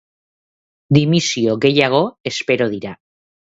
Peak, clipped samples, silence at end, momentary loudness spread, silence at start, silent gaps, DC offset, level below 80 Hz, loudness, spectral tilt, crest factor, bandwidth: 0 dBFS; under 0.1%; 0.55 s; 9 LU; 0.9 s; 2.20-2.24 s; under 0.1%; -56 dBFS; -16 LUFS; -5 dB/octave; 18 dB; 8 kHz